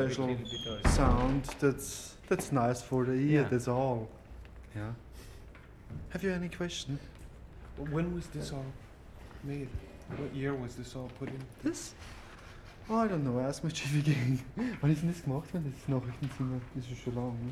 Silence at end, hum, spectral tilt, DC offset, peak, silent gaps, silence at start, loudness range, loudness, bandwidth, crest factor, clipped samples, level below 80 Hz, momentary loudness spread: 0 s; none; -6 dB/octave; under 0.1%; -12 dBFS; none; 0 s; 9 LU; -34 LUFS; 14 kHz; 22 dB; under 0.1%; -44 dBFS; 21 LU